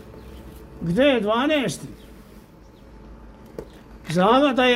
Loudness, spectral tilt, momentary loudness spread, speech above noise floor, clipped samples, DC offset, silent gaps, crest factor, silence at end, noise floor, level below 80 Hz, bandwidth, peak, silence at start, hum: -20 LUFS; -5.5 dB/octave; 25 LU; 28 dB; under 0.1%; under 0.1%; none; 18 dB; 0 s; -47 dBFS; -46 dBFS; 16 kHz; -4 dBFS; 0.05 s; none